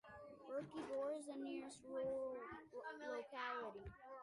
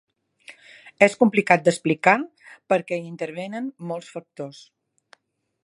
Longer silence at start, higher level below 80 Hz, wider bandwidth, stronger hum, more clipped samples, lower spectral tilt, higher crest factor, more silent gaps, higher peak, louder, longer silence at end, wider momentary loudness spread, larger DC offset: second, 0.05 s vs 0.5 s; about the same, -72 dBFS vs -72 dBFS; about the same, 11 kHz vs 11.5 kHz; neither; neither; about the same, -5 dB/octave vs -5.5 dB/octave; second, 14 dB vs 24 dB; neither; second, -36 dBFS vs 0 dBFS; second, -49 LUFS vs -22 LUFS; second, 0 s vs 1.15 s; second, 9 LU vs 19 LU; neither